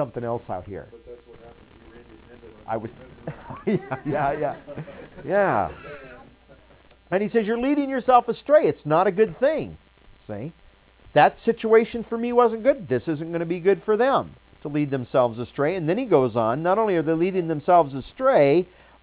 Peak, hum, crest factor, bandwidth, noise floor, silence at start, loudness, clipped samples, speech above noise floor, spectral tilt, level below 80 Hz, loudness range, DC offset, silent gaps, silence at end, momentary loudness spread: -4 dBFS; none; 20 dB; 4 kHz; -53 dBFS; 0 s; -22 LUFS; under 0.1%; 31 dB; -10.5 dB/octave; -54 dBFS; 8 LU; under 0.1%; none; 0.35 s; 19 LU